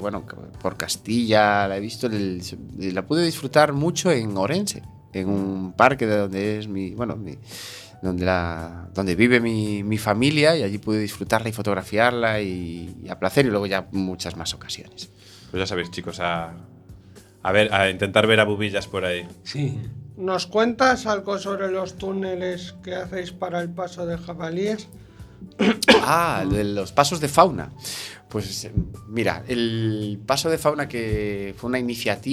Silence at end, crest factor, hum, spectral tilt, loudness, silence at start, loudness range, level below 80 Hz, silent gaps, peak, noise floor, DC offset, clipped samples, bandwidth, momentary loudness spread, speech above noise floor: 0 s; 22 dB; none; -5 dB/octave; -23 LUFS; 0 s; 7 LU; -46 dBFS; none; 0 dBFS; -47 dBFS; under 0.1%; under 0.1%; 19 kHz; 15 LU; 24 dB